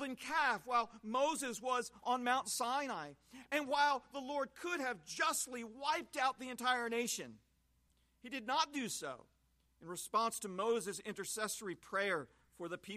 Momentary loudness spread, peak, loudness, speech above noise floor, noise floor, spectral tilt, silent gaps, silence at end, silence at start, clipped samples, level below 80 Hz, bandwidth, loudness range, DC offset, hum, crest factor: 12 LU; -20 dBFS; -38 LUFS; 37 dB; -76 dBFS; -2 dB/octave; none; 0 s; 0 s; under 0.1%; -76 dBFS; 15 kHz; 4 LU; under 0.1%; none; 20 dB